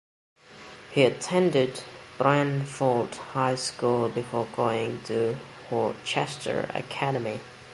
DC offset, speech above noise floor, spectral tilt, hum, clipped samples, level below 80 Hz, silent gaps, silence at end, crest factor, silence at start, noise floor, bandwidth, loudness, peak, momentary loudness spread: under 0.1%; 21 dB; -5.5 dB/octave; none; under 0.1%; -64 dBFS; none; 0 s; 22 dB; 0.5 s; -47 dBFS; 11.5 kHz; -27 LUFS; -6 dBFS; 11 LU